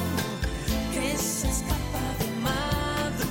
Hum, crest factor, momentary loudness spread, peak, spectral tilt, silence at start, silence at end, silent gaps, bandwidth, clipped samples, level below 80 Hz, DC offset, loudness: none; 12 dB; 3 LU; -14 dBFS; -4 dB/octave; 0 s; 0 s; none; 17 kHz; under 0.1%; -36 dBFS; under 0.1%; -28 LUFS